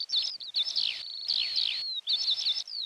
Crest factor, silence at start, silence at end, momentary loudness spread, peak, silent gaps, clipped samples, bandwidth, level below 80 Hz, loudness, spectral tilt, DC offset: 14 dB; 0 s; 0 s; 5 LU; -16 dBFS; none; under 0.1%; 14.5 kHz; -82 dBFS; -28 LUFS; 3 dB/octave; under 0.1%